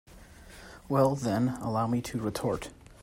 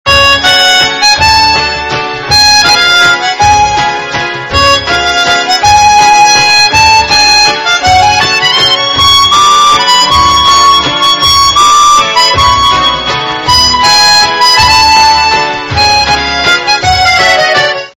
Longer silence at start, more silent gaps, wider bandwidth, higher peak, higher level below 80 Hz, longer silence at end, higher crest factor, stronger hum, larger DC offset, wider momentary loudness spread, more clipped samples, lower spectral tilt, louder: about the same, 0.1 s vs 0.05 s; neither; about the same, 16 kHz vs 16 kHz; second, -12 dBFS vs 0 dBFS; second, -54 dBFS vs -28 dBFS; about the same, 0.1 s vs 0.1 s; first, 20 dB vs 6 dB; neither; neither; first, 22 LU vs 6 LU; second, under 0.1% vs 6%; first, -6.5 dB/octave vs -1 dB/octave; second, -30 LUFS vs -4 LUFS